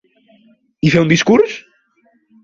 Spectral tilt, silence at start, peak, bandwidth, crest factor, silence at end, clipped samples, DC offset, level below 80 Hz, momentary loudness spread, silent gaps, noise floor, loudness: -5.5 dB/octave; 0.85 s; 0 dBFS; 7.6 kHz; 16 dB; 0.85 s; under 0.1%; under 0.1%; -50 dBFS; 8 LU; none; -58 dBFS; -13 LUFS